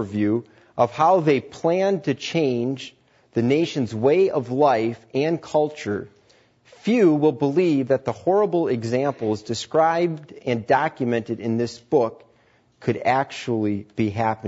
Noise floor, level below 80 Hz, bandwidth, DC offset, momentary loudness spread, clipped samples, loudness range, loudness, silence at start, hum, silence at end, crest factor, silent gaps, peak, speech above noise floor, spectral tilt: -59 dBFS; -64 dBFS; 8 kHz; under 0.1%; 9 LU; under 0.1%; 3 LU; -22 LUFS; 0 s; none; 0 s; 16 dB; none; -6 dBFS; 38 dB; -6.5 dB/octave